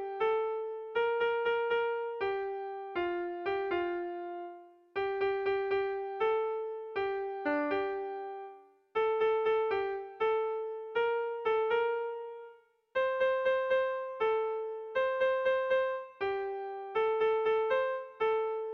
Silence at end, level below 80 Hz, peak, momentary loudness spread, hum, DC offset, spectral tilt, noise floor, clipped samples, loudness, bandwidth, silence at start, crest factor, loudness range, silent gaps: 0 s; -70 dBFS; -20 dBFS; 9 LU; none; under 0.1%; -5.5 dB/octave; -57 dBFS; under 0.1%; -32 LUFS; 5.6 kHz; 0 s; 12 dB; 3 LU; none